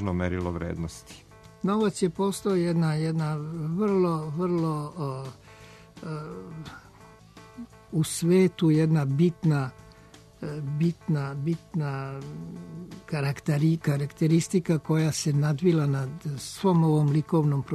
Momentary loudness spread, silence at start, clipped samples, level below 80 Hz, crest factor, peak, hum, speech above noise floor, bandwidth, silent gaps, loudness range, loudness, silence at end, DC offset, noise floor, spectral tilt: 17 LU; 0 s; under 0.1%; -56 dBFS; 16 dB; -12 dBFS; none; 26 dB; 13.5 kHz; none; 7 LU; -26 LUFS; 0 s; under 0.1%; -52 dBFS; -7 dB/octave